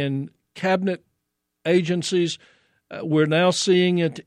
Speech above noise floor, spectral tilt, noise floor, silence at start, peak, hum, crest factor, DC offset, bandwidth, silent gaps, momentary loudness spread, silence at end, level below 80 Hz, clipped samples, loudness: 57 dB; -5 dB/octave; -78 dBFS; 0 s; -6 dBFS; none; 16 dB; under 0.1%; 11 kHz; none; 15 LU; 0.05 s; -68 dBFS; under 0.1%; -21 LUFS